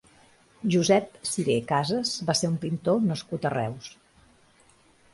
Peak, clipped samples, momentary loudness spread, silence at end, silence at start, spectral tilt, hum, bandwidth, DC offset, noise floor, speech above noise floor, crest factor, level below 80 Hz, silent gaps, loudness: -8 dBFS; under 0.1%; 9 LU; 1.25 s; 0.6 s; -5 dB/octave; none; 11.5 kHz; under 0.1%; -60 dBFS; 34 dB; 20 dB; -62 dBFS; none; -26 LUFS